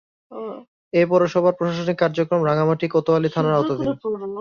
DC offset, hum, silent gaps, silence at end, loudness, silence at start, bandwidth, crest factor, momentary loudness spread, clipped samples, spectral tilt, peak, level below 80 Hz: under 0.1%; none; 0.68-0.91 s; 0 s; -20 LUFS; 0.3 s; 7 kHz; 16 dB; 16 LU; under 0.1%; -7.5 dB/octave; -4 dBFS; -58 dBFS